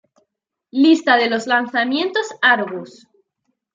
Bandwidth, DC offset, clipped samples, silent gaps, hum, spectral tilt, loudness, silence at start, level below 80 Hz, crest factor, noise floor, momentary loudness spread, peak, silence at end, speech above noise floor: 7.6 kHz; under 0.1%; under 0.1%; none; none; -3.5 dB/octave; -17 LUFS; 0.75 s; -74 dBFS; 18 dB; -74 dBFS; 11 LU; 0 dBFS; 0.85 s; 57 dB